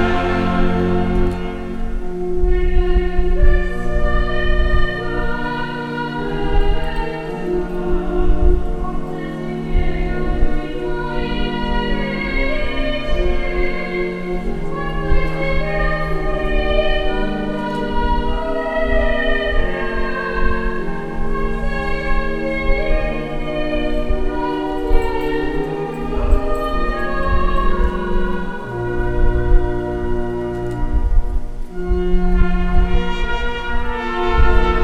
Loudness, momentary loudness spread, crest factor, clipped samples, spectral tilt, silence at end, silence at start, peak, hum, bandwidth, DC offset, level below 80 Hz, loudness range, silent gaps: -21 LUFS; 6 LU; 16 dB; under 0.1%; -7.5 dB/octave; 0 s; 0 s; 0 dBFS; none; 5 kHz; under 0.1%; -18 dBFS; 2 LU; none